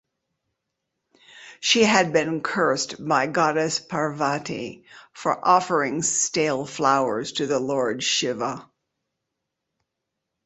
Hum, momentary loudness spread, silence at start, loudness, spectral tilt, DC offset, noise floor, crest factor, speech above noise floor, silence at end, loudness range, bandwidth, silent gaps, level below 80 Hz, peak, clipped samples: none; 10 LU; 1.35 s; -22 LUFS; -3 dB/octave; under 0.1%; -82 dBFS; 22 dB; 59 dB; 1.85 s; 3 LU; 8.4 kHz; none; -66 dBFS; -2 dBFS; under 0.1%